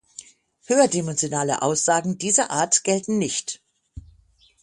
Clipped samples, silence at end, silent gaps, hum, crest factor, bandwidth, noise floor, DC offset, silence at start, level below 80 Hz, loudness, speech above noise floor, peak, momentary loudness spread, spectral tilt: under 0.1%; 0.65 s; none; none; 20 dB; 11.5 kHz; -57 dBFS; under 0.1%; 0.7 s; -56 dBFS; -21 LUFS; 36 dB; -4 dBFS; 13 LU; -3 dB/octave